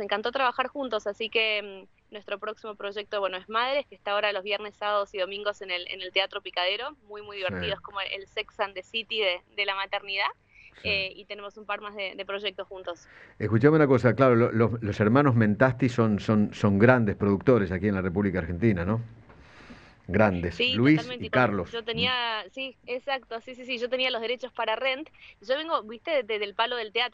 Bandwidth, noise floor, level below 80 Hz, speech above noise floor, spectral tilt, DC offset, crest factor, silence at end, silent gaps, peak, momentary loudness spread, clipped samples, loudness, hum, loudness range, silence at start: 8 kHz; -51 dBFS; -56 dBFS; 24 dB; -7 dB/octave; under 0.1%; 24 dB; 0.05 s; none; -2 dBFS; 14 LU; under 0.1%; -27 LUFS; none; 8 LU; 0 s